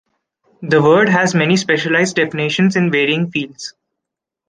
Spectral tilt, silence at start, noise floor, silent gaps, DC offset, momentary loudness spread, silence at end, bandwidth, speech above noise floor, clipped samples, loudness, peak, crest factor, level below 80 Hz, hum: -5 dB/octave; 0.6 s; -82 dBFS; none; under 0.1%; 14 LU; 0.8 s; 9.8 kHz; 67 dB; under 0.1%; -14 LUFS; 0 dBFS; 16 dB; -58 dBFS; none